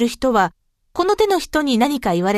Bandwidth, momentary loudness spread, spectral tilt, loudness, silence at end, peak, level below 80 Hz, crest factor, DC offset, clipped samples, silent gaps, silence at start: 14 kHz; 5 LU; -5 dB/octave; -18 LUFS; 0 s; -4 dBFS; -44 dBFS; 16 dB; under 0.1%; under 0.1%; none; 0 s